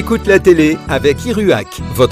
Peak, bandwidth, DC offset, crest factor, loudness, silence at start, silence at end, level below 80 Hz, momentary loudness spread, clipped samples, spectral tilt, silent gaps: 0 dBFS; 16 kHz; under 0.1%; 12 dB; -12 LUFS; 0 s; 0 s; -30 dBFS; 6 LU; 0.2%; -6 dB/octave; none